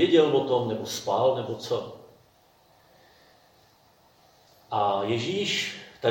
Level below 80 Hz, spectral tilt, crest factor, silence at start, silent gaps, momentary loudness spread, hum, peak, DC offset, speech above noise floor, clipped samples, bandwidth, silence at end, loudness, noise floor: -70 dBFS; -4.5 dB/octave; 20 dB; 0 s; none; 10 LU; none; -8 dBFS; under 0.1%; 35 dB; under 0.1%; 17 kHz; 0 s; -26 LUFS; -60 dBFS